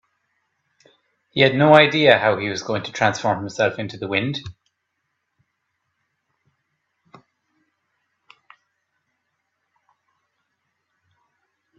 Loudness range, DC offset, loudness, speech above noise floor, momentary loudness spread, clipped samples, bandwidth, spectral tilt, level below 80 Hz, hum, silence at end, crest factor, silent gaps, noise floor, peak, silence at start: 14 LU; under 0.1%; -18 LUFS; 57 dB; 16 LU; under 0.1%; 8 kHz; -5 dB/octave; -62 dBFS; none; 7.25 s; 24 dB; none; -75 dBFS; 0 dBFS; 1.35 s